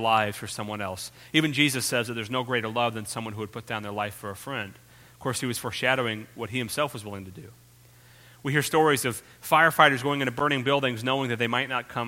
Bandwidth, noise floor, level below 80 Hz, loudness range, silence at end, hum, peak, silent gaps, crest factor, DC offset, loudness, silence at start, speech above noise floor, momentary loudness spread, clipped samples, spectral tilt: 16.5 kHz; -54 dBFS; -64 dBFS; 8 LU; 0 s; none; -2 dBFS; none; 26 dB; under 0.1%; -26 LUFS; 0 s; 27 dB; 14 LU; under 0.1%; -4 dB/octave